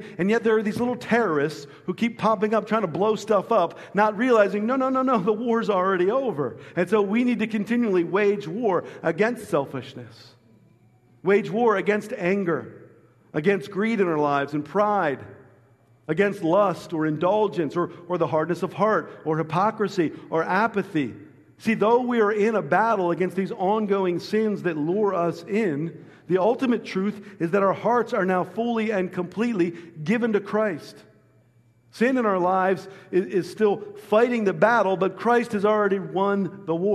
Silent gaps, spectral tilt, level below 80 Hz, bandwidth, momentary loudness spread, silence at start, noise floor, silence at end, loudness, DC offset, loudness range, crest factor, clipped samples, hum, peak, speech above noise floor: none; -7 dB/octave; -70 dBFS; 13 kHz; 7 LU; 0 s; -59 dBFS; 0 s; -23 LUFS; under 0.1%; 4 LU; 20 dB; under 0.1%; none; -4 dBFS; 36 dB